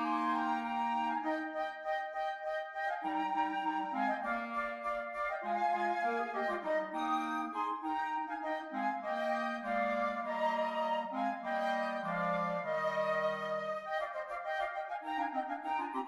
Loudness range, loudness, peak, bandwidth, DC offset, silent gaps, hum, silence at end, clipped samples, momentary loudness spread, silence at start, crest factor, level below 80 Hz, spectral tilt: 1 LU; -36 LUFS; -22 dBFS; 12 kHz; under 0.1%; none; none; 0 s; under 0.1%; 5 LU; 0 s; 14 dB; -72 dBFS; -5.5 dB/octave